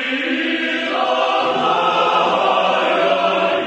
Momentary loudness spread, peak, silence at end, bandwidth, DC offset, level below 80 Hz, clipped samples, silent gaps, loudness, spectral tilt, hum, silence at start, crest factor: 3 LU; -4 dBFS; 0 s; 9 kHz; under 0.1%; -66 dBFS; under 0.1%; none; -16 LUFS; -4 dB/octave; none; 0 s; 14 dB